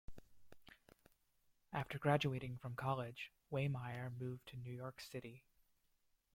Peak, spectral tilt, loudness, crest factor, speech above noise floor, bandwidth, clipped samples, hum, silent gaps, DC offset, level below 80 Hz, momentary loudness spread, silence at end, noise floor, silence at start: -22 dBFS; -6.5 dB/octave; -44 LUFS; 24 dB; 38 dB; 16 kHz; under 0.1%; none; none; under 0.1%; -70 dBFS; 13 LU; 0.95 s; -81 dBFS; 0.1 s